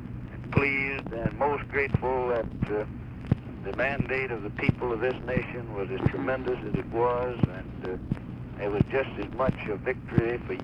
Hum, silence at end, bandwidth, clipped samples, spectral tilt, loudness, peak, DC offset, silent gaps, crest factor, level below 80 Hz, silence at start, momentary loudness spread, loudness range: none; 0 s; 6.2 kHz; under 0.1%; -9 dB/octave; -29 LUFS; -8 dBFS; under 0.1%; none; 22 dB; -44 dBFS; 0 s; 8 LU; 2 LU